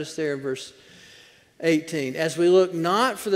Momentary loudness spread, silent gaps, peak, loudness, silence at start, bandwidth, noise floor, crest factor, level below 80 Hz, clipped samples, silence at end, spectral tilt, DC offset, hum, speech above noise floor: 12 LU; none; -8 dBFS; -23 LUFS; 0 s; 16 kHz; -52 dBFS; 16 dB; -70 dBFS; under 0.1%; 0 s; -5 dB/octave; under 0.1%; none; 29 dB